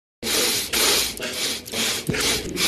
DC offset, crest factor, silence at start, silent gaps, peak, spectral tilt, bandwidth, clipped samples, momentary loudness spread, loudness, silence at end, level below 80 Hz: under 0.1%; 20 dB; 0.2 s; none; -4 dBFS; -1 dB/octave; 14 kHz; under 0.1%; 7 LU; -21 LUFS; 0 s; -46 dBFS